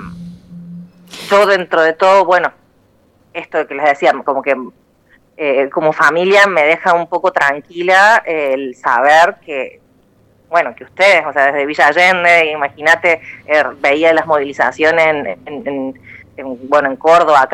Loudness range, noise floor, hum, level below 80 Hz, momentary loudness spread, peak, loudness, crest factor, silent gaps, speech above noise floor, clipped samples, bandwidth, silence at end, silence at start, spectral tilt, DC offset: 4 LU; -52 dBFS; none; -56 dBFS; 15 LU; 0 dBFS; -12 LUFS; 14 dB; none; 40 dB; under 0.1%; 14.5 kHz; 0 s; 0 s; -4 dB/octave; under 0.1%